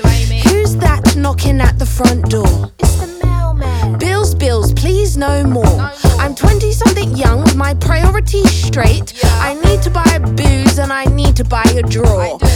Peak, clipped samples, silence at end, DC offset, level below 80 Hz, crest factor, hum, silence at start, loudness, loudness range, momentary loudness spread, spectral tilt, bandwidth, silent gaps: 0 dBFS; 0.4%; 0 s; under 0.1%; -16 dBFS; 10 dB; none; 0 s; -12 LUFS; 2 LU; 3 LU; -5.5 dB/octave; 17.5 kHz; none